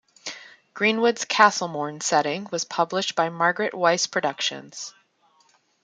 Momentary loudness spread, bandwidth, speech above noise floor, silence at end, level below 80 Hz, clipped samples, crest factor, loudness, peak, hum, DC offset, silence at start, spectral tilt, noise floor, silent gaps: 18 LU; 10 kHz; 39 dB; 0.95 s; -74 dBFS; under 0.1%; 22 dB; -22 LUFS; -2 dBFS; none; under 0.1%; 0.25 s; -2.5 dB/octave; -62 dBFS; none